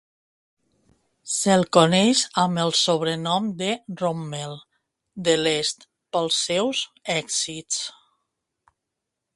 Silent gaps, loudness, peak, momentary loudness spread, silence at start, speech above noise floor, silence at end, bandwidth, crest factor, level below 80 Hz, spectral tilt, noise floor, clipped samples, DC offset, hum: none; -22 LUFS; 0 dBFS; 13 LU; 1.25 s; 60 dB; 1.45 s; 11.5 kHz; 24 dB; -64 dBFS; -3.5 dB/octave; -83 dBFS; under 0.1%; under 0.1%; none